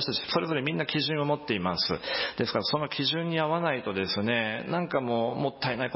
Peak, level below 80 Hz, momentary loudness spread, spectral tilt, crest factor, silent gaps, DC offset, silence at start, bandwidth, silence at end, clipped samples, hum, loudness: -10 dBFS; -60 dBFS; 3 LU; -8.5 dB/octave; 18 dB; none; under 0.1%; 0 s; 5.8 kHz; 0 s; under 0.1%; none; -28 LUFS